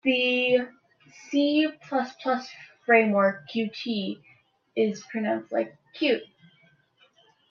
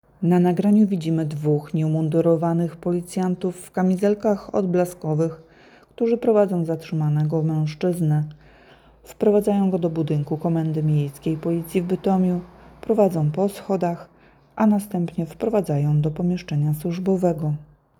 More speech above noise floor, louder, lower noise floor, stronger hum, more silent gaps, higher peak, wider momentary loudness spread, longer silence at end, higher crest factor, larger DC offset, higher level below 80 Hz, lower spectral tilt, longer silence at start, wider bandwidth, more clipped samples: first, 38 dB vs 30 dB; second, -26 LUFS vs -22 LUFS; first, -63 dBFS vs -51 dBFS; neither; neither; about the same, -6 dBFS vs -6 dBFS; first, 14 LU vs 7 LU; first, 1.25 s vs 0.35 s; first, 22 dB vs 16 dB; neither; second, -76 dBFS vs -56 dBFS; second, -5.5 dB/octave vs -8.5 dB/octave; second, 0.05 s vs 0.2 s; second, 7 kHz vs 14.5 kHz; neither